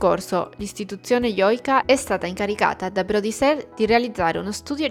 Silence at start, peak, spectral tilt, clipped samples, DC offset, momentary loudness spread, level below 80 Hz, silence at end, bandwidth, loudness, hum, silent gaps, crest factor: 0 s; -2 dBFS; -4.5 dB/octave; under 0.1%; under 0.1%; 9 LU; -48 dBFS; 0 s; 17 kHz; -22 LUFS; none; none; 18 dB